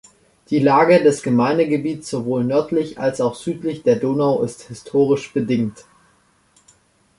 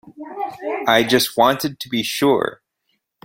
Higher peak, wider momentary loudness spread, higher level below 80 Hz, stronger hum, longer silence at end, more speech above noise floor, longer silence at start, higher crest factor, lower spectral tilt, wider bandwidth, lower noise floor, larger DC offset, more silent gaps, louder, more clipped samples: about the same, -2 dBFS vs 0 dBFS; about the same, 11 LU vs 13 LU; about the same, -58 dBFS vs -58 dBFS; neither; first, 1.45 s vs 0.7 s; second, 40 dB vs 53 dB; first, 0.5 s vs 0.05 s; about the same, 16 dB vs 20 dB; first, -6.5 dB/octave vs -3.5 dB/octave; second, 11.5 kHz vs 16.5 kHz; second, -58 dBFS vs -71 dBFS; neither; neither; about the same, -19 LUFS vs -19 LUFS; neither